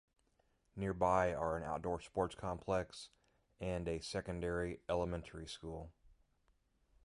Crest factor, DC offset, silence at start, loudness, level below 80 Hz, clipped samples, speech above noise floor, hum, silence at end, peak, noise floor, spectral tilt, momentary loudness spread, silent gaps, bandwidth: 22 dB; under 0.1%; 0.75 s; -40 LUFS; -56 dBFS; under 0.1%; 38 dB; none; 1.15 s; -18 dBFS; -77 dBFS; -6 dB/octave; 15 LU; none; 11.5 kHz